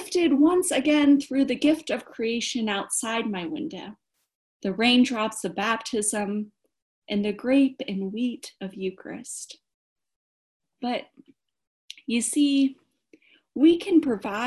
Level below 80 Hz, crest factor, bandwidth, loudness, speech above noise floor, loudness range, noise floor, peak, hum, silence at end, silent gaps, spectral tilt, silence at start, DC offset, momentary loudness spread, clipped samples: -66 dBFS; 18 dB; 12.5 kHz; -24 LUFS; 36 dB; 10 LU; -60 dBFS; -8 dBFS; none; 0 s; 4.35-4.60 s, 6.82-7.02 s, 9.74-9.96 s, 10.16-10.60 s, 11.67-11.88 s; -3.5 dB/octave; 0 s; under 0.1%; 16 LU; under 0.1%